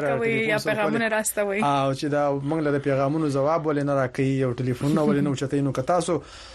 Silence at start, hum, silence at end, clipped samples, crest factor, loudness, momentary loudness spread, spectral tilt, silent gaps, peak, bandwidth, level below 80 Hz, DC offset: 0 s; none; 0 s; under 0.1%; 14 dB; -24 LUFS; 3 LU; -6 dB/octave; none; -10 dBFS; 13 kHz; -54 dBFS; under 0.1%